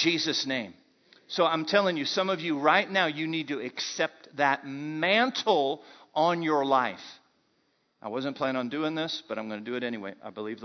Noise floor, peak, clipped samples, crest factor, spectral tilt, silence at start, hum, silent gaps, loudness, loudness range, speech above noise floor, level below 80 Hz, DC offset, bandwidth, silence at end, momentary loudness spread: -72 dBFS; -8 dBFS; under 0.1%; 22 dB; -4 dB/octave; 0 s; none; none; -28 LUFS; 7 LU; 43 dB; -80 dBFS; under 0.1%; 6.4 kHz; 0 s; 13 LU